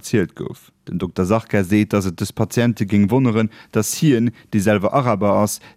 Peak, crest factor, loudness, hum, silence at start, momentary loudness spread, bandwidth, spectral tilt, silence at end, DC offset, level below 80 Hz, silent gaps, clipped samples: -2 dBFS; 16 dB; -18 LUFS; none; 0.05 s; 10 LU; 16 kHz; -6 dB/octave; 0.1 s; under 0.1%; -52 dBFS; none; under 0.1%